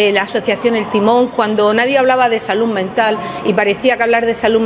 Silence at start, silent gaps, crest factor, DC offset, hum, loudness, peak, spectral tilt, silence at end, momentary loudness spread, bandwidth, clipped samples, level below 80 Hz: 0 s; none; 14 dB; under 0.1%; none; -14 LUFS; 0 dBFS; -9 dB/octave; 0 s; 4 LU; 4 kHz; under 0.1%; -50 dBFS